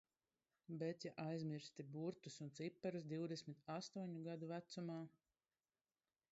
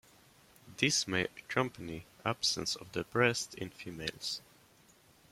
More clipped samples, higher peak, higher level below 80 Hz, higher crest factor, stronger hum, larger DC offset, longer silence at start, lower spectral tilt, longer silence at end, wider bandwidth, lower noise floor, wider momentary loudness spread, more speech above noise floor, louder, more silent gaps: neither; second, -34 dBFS vs -12 dBFS; second, under -90 dBFS vs -66 dBFS; second, 18 dB vs 24 dB; neither; neither; about the same, 0.7 s vs 0.65 s; first, -6 dB/octave vs -3 dB/octave; first, 1.2 s vs 0.9 s; second, 7.6 kHz vs 16.5 kHz; first, under -90 dBFS vs -64 dBFS; second, 6 LU vs 14 LU; first, over 40 dB vs 29 dB; second, -50 LUFS vs -34 LUFS; neither